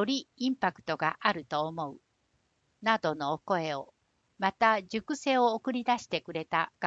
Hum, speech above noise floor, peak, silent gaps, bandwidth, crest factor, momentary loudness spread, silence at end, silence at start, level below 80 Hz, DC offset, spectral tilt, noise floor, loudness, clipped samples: none; 44 dB; -10 dBFS; none; 8 kHz; 22 dB; 8 LU; 0 s; 0 s; -72 dBFS; under 0.1%; -4.5 dB/octave; -74 dBFS; -30 LUFS; under 0.1%